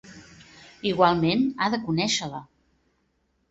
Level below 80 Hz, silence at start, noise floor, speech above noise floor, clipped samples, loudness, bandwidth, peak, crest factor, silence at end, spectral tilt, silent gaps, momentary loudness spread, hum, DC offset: -58 dBFS; 0.05 s; -71 dBFS; 47 dB; under 0.1%; -24 LUFS; 8 kHz; -4 dBFS; 22 dB; 1.05 s; -4.5 dB/octave; none; 12 LU; none; under 0.1%